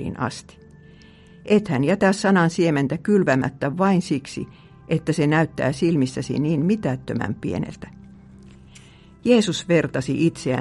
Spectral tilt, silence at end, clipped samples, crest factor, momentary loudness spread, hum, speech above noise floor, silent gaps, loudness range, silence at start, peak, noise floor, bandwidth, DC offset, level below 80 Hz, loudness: -6.5 dB/octave; 0 s; under 0.1%; 18 dB; 11 LU; none; 27 dB; none; 5 LU; 0 s; -4 dBFS; -47 dBFS; 11.5 kHz; under 0.1%; -52 dBFS; -21 LUFS